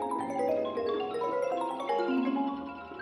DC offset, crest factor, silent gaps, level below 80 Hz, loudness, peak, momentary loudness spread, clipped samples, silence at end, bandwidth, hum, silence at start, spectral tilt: under 0.1%; 14 dB; none; -70 dBFS; -32 LUFS; -18 dBFS; 4 LU; under 0.1%; 0 s; 12 kHz; none; 0 s; -5.5 dB/octave